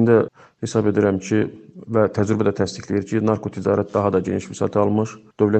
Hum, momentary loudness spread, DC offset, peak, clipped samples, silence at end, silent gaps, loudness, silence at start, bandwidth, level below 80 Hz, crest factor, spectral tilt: none; 7 LU; under 0.1%; -2 dBFS; under 0.1%; 0 s; none; -21 LUFS; 0 s; 8.8 kHz; -56 dBFS; 18 dB; -7 dB/octave